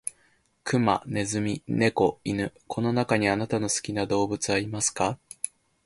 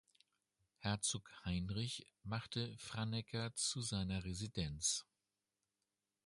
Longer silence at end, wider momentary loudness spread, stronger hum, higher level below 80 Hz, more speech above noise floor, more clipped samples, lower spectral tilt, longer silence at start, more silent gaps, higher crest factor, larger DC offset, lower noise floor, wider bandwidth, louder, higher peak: second, 0.4 s vs 1.25 s; first, 10 LU vs 7 LU; neither; about the same, -56 dBFS vs -60 dBFS; second, 39 dB vs over 47 dB; neither; about the same, -4.5 dB/octave vs -3.5 dB/octave; second, 0.05 s vs 0.8 s; neither; about the same, 20 dB vs 20 dB; neither; second, -65 dBFS vs under -90 dBFS; about the same, 11.5 kHz vs 11.5 kHz; first, -27 LUFS vs -42 LUFS; first, -8 dBFS vs -24 dBFS